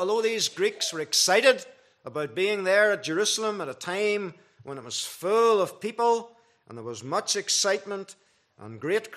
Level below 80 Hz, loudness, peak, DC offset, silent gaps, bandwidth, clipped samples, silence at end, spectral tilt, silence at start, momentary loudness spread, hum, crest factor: -82 dBFS; -25 LUFS; -6 dBFS; under 0.1%; none; 15 kHz; under 0.1%; 0 s; -1.5 dB/octave; 0 s; 17 LU; none; 20 dB